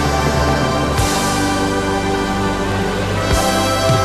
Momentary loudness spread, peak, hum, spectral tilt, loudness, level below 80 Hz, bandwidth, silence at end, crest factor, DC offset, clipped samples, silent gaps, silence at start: 3 LU; -2 dBFS; none; -4.5 dB/octave; -17 LUFS; -26 dBFS; 14.5 kHz; 0 s; 14 dB; under 0.1%; under 0.1%; none; 0 s